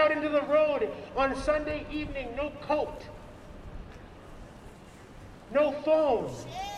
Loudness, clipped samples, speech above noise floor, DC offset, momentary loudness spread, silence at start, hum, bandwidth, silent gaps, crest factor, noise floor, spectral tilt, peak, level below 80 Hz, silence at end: -29 LUFS; under 0.1%; 20 dB; under 0.1%; 24 LU; 0 s; none; 11.5 kHz; none; 18 dB; -49 dBFS; -5.5 dB/octave; -12 dBFS; -48 dBFS; 0 s